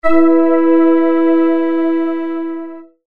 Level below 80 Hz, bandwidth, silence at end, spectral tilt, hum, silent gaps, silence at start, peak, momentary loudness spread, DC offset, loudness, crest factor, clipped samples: -46 dBFS; 4.2 kHz; 0 s; -8 dB/octave; none; none; 0 s; 0 dBFS; 12 LU; under 0.1%; -13 LUFS; 12 dB; under 0.1%